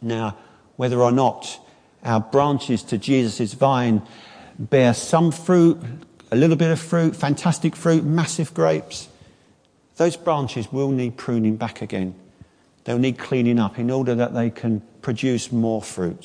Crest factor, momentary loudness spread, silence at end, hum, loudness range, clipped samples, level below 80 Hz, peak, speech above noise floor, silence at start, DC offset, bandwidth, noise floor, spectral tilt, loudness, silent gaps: 16 dB; 11 LU; 0.1 s; none; 5 LU; under 0.1%; -62 dBFS; -4 dBFS; 38 dB; 0 s; under 0.1%; 10.5 kHz; -58 dBFS; -6.5 dB/octave; -21 LUFS; none